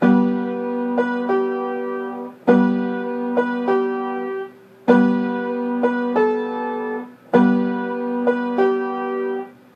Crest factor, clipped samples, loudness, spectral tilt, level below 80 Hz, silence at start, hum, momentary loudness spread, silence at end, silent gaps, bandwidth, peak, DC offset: 20 dB; under 0.1%; -21 LUFS; -8.5 dB/octave; -72 dBFS; 0 s; none; 10 LU; 0.25 s; none; 5.4 kHz; 0 dBFS; under 0.1%